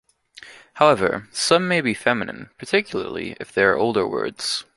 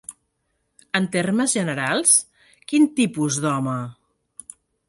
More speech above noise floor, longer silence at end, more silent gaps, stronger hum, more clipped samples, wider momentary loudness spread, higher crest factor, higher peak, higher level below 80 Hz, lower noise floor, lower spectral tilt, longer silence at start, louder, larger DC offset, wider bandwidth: second, 25 dB vs 52 dB; second, 0.15 s vs 0.95 s; neither; neither; neither; second, 12 LU vs 23 LU; about the same, 20 dB vs 20 dB; about the same, -2 dBFS vs -2 dBFS; first, -56 dBFS vs -66 dBFS; second, -46 dBFS vs -72 dBFS; about the same, -4 dB/octave vs -3.5 dB/octave; first, 0.4 s vs 0.1 s; about the same, -21 LUFS vs -20 LUFS; neither; about the same, 11.5 kHz vs 11.5 kHz